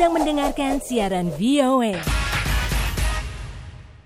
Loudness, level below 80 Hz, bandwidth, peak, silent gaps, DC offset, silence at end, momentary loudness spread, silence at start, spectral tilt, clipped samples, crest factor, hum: -22 LUFS; -28 dBFS; 16 kHz; -8 dBFS; none; under 0.1%; 0.05 s; 16 LU; 0 s; -5 dB/octave; under 0.1%; 14 dB; none